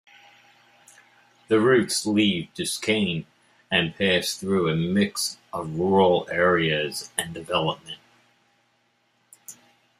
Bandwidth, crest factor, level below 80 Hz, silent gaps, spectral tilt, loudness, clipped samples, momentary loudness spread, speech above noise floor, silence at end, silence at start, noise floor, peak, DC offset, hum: 15 kHz; 20 dB; -62 dBFS; none; -4 dB/octave; -23 LUFS; under 0.1%; 13 LU; 44 dB; 0.45 s; 1.5 s; -67 dBFS; -6 dBFS; under 0.1%; none